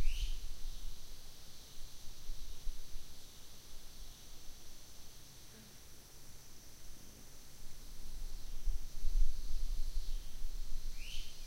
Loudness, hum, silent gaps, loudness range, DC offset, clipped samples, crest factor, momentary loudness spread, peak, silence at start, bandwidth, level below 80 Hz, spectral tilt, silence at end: -50 LUFS; none; none; 9 LU; under 0.1%; under 0.1%; 18 dB; 12 LU; -18 dBFS; 0 s; 15.5 kHz; -40 dBFS; -3 dB/octave; 0 s